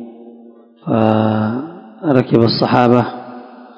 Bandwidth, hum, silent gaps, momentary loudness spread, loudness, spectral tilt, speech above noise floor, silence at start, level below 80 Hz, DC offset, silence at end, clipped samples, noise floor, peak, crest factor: 6.6 kHz; none; none; 20 LU; -15 LUFS; -9 dB/octave; 29 dB; 0 s; -52 dBFS; under 0.1%; 0.1 s; 0.4%; -42 dBFS; 0 dBFS; 16 dB